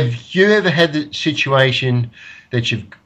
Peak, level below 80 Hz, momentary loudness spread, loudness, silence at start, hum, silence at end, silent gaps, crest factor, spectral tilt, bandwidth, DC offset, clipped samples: 0 dBFS; -52 dBFS; 8 LU; -16 LUFS; 0 s; none; 0.2 s; none; 16 dB; -5.5 dB/octave; 8.6 kHz; under 0.1%; under 0.1%